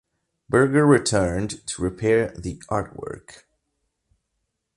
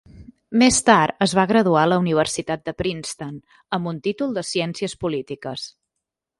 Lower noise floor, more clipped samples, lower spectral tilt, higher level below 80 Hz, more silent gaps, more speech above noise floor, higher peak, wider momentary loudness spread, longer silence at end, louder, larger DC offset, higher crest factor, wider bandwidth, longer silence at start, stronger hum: second, -77 dBFS vs -82 dBFS; neither; about the same, -5.5 dB/octave vs -4.5 dB/octave; first, -46 dBFS vs -52 dBFS; neither; second, 56 dB vs 62 dB; second, -4 dBFS vs 0 dBFS; about the same, 17 LU vs 15 LU; first, 1.45 s vs 0.7 s; about the same, -21 LUFS vs -20 LUFS; neither; about the same, 20 dB vs 20 dB; about the same, 11.5 kHz vs 11.5 kHz; first, 0.5 s vs 0.15 s; neither